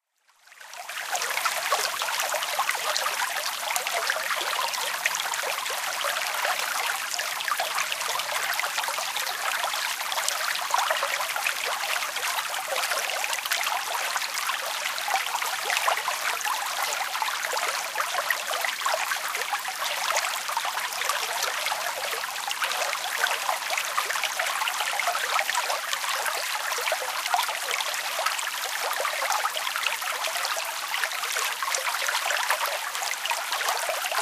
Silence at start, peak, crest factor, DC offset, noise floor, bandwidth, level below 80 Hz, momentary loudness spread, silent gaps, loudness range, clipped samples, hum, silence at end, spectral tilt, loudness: 0.5 s; -2 dBFS; 26 dB; under 0.1%; -60 dBFS; 16 kHz; -82 dBFS; 3 LU; none; 1 LU; under 0.1%; none; 0 s; 3 dB/octave; -26 LUFS